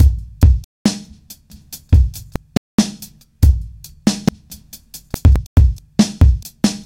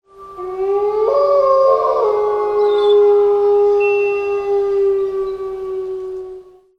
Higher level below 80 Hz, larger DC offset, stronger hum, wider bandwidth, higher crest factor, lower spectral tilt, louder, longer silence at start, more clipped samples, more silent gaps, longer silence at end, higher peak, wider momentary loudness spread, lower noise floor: first, -18 dBFS vs -52 dBFS; neither; neither; first, 16.5 kHz vs 6.2 kHz; about the same, 14 dB vs 12 dB; about the same, -6 dB/octave vs -5.5 dB/octave; about the same, -17 LUFS vs -15 LUFS; second, 0 s vs 0.2 s; neither; first, 0.64-0.85 s, 2.57-2.78 s, 5.46-5.56 s vs none; second, 0.05 s vs 0.35 s; about the same, -2 dBFS vs -2 dBFS; first, 22 LU vs 13 LU; first, -42 dBFS vs -37 dBFS